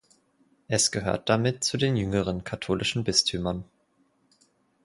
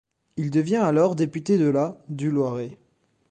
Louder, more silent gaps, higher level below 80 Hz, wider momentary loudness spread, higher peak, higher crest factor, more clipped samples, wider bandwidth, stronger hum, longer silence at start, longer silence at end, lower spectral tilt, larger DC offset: second, -26 LUFS vs -23 LUFS; neither; first, -50 dBFS vs -64 dBFS; second, 8 LU vs 11 LU; about the same, -8 dBFS vs -8 dBFS; about the same, 20 dB vs 16 dB; neither; first, 11.5 kHz vs 9.4 kHz; neither; first, 0.7 s vs 0.35 s; first, 1.2 s vs 0.55 s; second, -3.5 dB/octave vs -8 dB/octave; neither